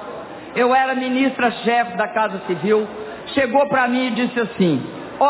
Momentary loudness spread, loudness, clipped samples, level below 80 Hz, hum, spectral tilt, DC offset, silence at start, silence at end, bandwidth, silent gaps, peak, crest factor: 11 LU; -19 LUFS; under 0.1%; -58 dBFS; none; -9.5 dB/octave; under 0.1%; 0 s; 0 s; 4 kHz; none; -4 dBFS; 16 dB